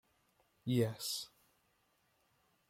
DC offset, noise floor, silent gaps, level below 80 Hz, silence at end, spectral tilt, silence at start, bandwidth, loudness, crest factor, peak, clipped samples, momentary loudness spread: under 0.1%; -77 dBFS; none; -78 dBFS; 1.45 s; -5 dB/octave; 0.65 s; 16.5 kHz; -38 LUFS; 22 dB; -22 dBFS; under 0.1%; 13 LU